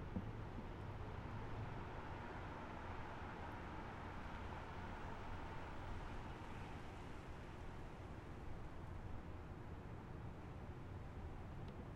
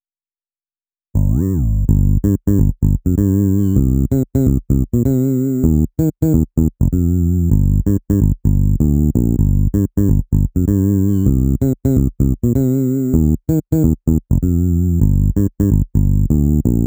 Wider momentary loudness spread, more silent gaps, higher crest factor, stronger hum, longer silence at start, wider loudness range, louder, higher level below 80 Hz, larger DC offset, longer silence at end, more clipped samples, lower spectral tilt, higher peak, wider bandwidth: about the same, 4 LU vs 2 LU; neither; about the same, 16 dB vs 14 dB; neither; second, 0 s vs 1.15 s; about the same, 3 LU vs 1 LU; second, -52 LUFS vs -16 LUFS; second, -56 dBFS vs -20 dBFS; neither; about the same, 0 s vs 0 s; neither; second, -7 dB/octave vs -10.5 dB/octave; second, -34 dBFS vs 0 dBFS; second, 13 kHz vs over 20 kHz